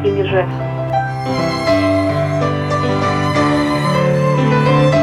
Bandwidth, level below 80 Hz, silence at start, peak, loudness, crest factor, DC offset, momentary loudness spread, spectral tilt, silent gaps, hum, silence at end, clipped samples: 12.5 kHz; -40 dBFS; 0 s; -2 dBFS; -15 LUFS; 12 dB; under 0.1%; 6 LU; -7 dB/octave; none; none; 0 s; under 0.1%